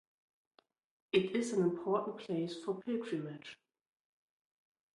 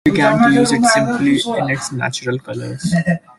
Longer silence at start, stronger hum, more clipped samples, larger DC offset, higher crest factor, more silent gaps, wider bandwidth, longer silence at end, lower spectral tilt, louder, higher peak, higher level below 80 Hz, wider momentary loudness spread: first, 1.15 s vs 0.05 s; neither; neither; neither; first, 22 dB vs 14 dB; neither; about the same, 11.5 kHz vs 12.5 kHz; first, 1.4 s vs 0.2 s; about the same, -6 dB/octave vs -5 dB/octave; second, -36 LUFS vs -15 LUFS; second, -18 dBFS vs -2 dBFS; second, -80 dBFS vs -50 dBFS; about the same, 10 LU vs 11 LU